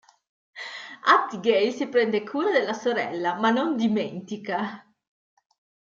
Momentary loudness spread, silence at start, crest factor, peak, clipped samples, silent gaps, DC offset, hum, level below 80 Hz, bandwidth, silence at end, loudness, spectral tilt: 14 LU; 0.55 s; 22 dB; -4 dBFS; under 0.1%; none; under 0.1%; none; -76 dBFS; 7.6 kHz; 1.1 s; -24 LUFS; -5 dB/octave